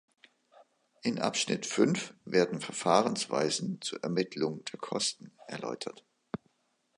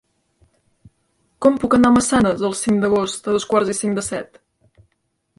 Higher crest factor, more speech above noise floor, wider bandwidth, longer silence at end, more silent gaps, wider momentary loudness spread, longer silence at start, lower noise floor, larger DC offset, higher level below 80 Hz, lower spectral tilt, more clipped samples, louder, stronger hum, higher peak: first, 24 dB vs 18 dB; second, 44 dB vs 53 dB; about the same, 11.5 kHz vs 11.5 kHz; about the same, 1.05 s vs 1.15 s; neither; first, 16 LU vs 10 LU; second, 1.05 s vs 1.4 s; first, -76 dBFS vs -70 dBFS; neither; second, -76 dBFS vs -48 dBFS; about the same, -4 dB/octave vs -4.5 dB/octave; neither; second, -31 LUFS vs -18 LUFS; neither; second, -8 dBFS vs -2 dBFS